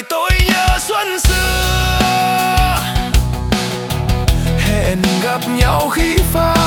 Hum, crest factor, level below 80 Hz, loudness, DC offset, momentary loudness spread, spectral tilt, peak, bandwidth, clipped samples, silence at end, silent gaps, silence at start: none; 14 dB; -20 dBFS; -15 LUFS; under 0.1%; 4 LU; -4.5 dB/octave; 0 dBFS; 19 kHz; under 0.1%; 0 s; none; 0 s